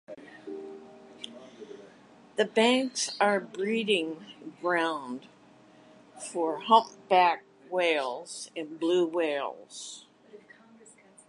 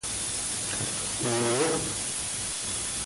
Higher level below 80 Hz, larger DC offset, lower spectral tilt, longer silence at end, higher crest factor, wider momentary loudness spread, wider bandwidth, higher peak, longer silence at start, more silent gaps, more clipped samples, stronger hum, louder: second, -84 dBFS vs -52 dBFS; neither; about the same, -3 dB/octave vs -2.5 dB/octave; first, 0.9 s vs 0 s; first, 22 dB vs 16 dB; first, 22 LU vs 4 LU; about the same, 11.5 kHz vs 12 kHz; first, -8 dBFS vs -14 dBFS; about the same, 0.1 s vs 0.05 s; neither; neither; neither; about the same, -28 LUFS vs -28 LUFS